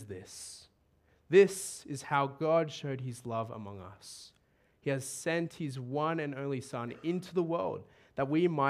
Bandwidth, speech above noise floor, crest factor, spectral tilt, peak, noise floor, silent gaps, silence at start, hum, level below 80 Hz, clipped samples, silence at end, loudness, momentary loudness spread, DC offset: 14.5 kHz; 38 dB; 20 dB; -5.5 dB/octave; -12 dBFS; -70 dBFS; none; 0 s; none; -74 dBFS; under 0.1%; 0 s; -33 LUFS; 18 LU; under 0.1%